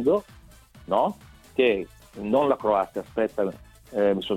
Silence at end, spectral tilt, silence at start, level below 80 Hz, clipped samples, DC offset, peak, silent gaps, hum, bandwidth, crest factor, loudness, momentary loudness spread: 0 s; -6.5 dB/octave; 0 s; -54 dBFS; under 0.1%; under 0.1%; -8 dBFS; none; none; 15.5 kHz; 18 dB; -25 LUFS; 11 LU